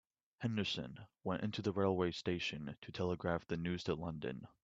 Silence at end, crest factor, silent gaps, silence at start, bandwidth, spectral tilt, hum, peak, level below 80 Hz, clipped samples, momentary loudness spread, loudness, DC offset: 0.15 s; 20 dB; 2.78-2.82 s; 0.4 s; 7.8 kHz; -6 dB/octave; none; -20 dBFS; -68 dBFS; under 0.1%; 10 LU; -40 LUFS; under 0.1%